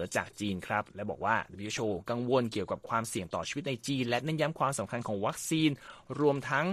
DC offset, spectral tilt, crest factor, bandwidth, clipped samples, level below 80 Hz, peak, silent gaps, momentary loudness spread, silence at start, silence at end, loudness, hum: under 0.1%; -5 dB/octave; 20 dB; 14.5 kHz; under 0.1%; -64 dBFS; -12 dBFS; none; 6 LU; 0 s; 0 s; -32 LUFS; none